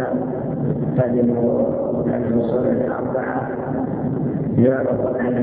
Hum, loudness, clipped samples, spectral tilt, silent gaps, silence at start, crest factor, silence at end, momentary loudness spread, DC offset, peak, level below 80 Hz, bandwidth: none; -20 LUFS; under 0.1%; -13.5 dB/octave; none; 0 s; 16 dB; 0 s; 6 LU; under 0.1%; -4 dBFS; -46 dBFS; 3.9 kHz